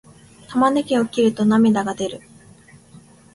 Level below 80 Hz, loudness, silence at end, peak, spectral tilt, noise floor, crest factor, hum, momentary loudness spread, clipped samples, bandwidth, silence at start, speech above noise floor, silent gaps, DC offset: -58 dBFS; -19 LUFS; 1.15 s; -6 dBFS; -6 dB/octave; -47 dBFS; 16 dB; none; 11 LU; under 0.1%; 11.5 kHz; 0.5 s; 30 dB; none; under 0.1%